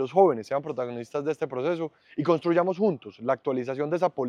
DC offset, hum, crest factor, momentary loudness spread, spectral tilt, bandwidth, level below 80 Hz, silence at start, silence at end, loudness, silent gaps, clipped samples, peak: under 0.1%; none; 18 dB; 10 LU; -7.5 dB/octave; 9.8 kHz; -76 dBFS; 0 s; 0 s; -27 LUFS; none; under 0.1%; -8 dBFS